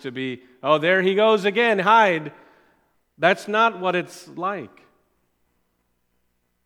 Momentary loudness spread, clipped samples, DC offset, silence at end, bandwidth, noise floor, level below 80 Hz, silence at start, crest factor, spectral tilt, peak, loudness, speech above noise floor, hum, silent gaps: 14 LU; under 0.1%; under 0.1%; 2 s; 15 kHz; -71 dBFS; -76 dBFS; 0.05 s; 20 dB; -5 dB/octave; -2 dBFS; -20 LUFS; 50 dB; 60 Hz at -55 dBFS; none